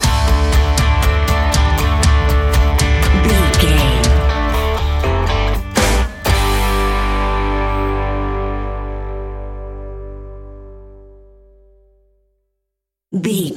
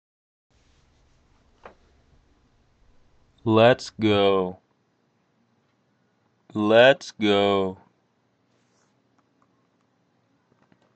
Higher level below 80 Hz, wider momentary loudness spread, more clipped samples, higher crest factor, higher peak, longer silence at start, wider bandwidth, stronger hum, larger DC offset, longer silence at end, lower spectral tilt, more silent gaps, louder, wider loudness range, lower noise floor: first, -18 dBFS vs -64 dBFS; about the same, 16 LU vs 16 LU; neither; second, 16 dB vs 22 dB; first, 0 dBFS vs -4 dBFS; second, 0 s vs 3.45 s; first, 17 kHz vs 8.6 kHz; neither; neither; second, 0 s vs 3.2 s; about the same, -5 dB/octave vs -6 dB/octave; neither; first, -16 LUFS vs -21 LUFS; first, 17 LU vs 5 LU; first, -79 dBFS vs -68 dBFS